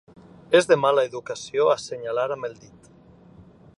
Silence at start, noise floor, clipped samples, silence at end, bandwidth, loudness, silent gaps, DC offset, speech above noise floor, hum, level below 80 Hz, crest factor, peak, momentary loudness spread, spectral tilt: 0.5 s; -51 dBFS; under 0.1%; 1.25 s; 11.5 kHz; -22 LUFS; none; under 0.1%; 28 dB; none; -64 dBFS; 20 dB; -4 dBFS; 13 LU; -4 dB/octave